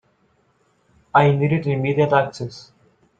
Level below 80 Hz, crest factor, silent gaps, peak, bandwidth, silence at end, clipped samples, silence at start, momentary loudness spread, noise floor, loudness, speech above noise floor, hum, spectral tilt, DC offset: -56 dBFS; 20 dB; none; -2 dBFS; 7.8 kHz; 0.6 s; under 0.1%; 1.15 s; 13 LU; -63 dBFS; -19 LUFS; 44 dB; none; -8 dB/octave; under 0.1%